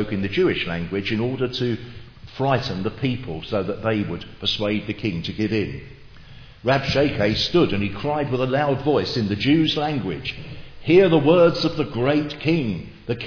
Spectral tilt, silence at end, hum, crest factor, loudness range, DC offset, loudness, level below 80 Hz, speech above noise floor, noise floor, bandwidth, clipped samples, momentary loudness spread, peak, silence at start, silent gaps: -7 dB/octave; 0 s; none; 18 dB; 6 LU; under 0.1%; -22 LUFS; -44 dBFS; 21 dB; -42 dBFS; 5.4 kHz; under 0.1%; 13 LU; -4 dBFS; 0 s; none